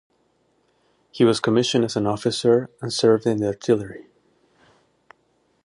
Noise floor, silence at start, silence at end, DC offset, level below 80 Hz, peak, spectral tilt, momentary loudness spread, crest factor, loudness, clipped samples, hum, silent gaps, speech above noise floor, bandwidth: -66 dBFS; 1.15 s; 1.6 s; under 0.1%; -60 dBFS; -4 dBFS; -5.5 dB/octave; 9 LU; 18 dB; -21 LUFS; under 0.1%; none; none; 45 dB; 11 kHz